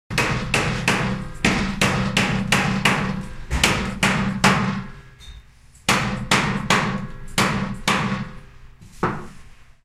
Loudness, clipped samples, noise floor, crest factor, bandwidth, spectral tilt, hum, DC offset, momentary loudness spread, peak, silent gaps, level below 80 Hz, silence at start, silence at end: -21 LUFS; under 0.1%; -47 dBFS; 22 dB; 15.5 kHz; -4 dB/octave; none; under 0.1%; 9 LU; 0 dBFS; none; -36 dBFS; 0.1 s; 0.2 s